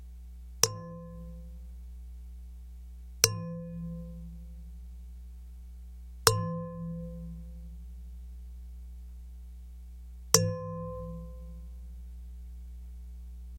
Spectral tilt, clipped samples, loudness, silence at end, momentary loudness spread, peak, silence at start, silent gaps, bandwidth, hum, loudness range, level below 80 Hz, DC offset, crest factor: -3 dB/octave; under 0.1%; -31 LUFS; 0 s; 22 LU; -4 dBFS; 0 s; none; 16.5 kHz; none; 8 LU; -46 dBFS; under 0.1%; 34 dB